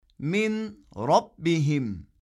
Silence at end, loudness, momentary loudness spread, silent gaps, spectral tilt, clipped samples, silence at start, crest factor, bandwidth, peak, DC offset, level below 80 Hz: 0.2 s; -26 LUFS; 10 LU; none; -6.5 dB/octave; under 0.1%; 0.2 s; 18 dB; 11.5 kHz; -8 dBFS; under 0.1%; -58 dBFS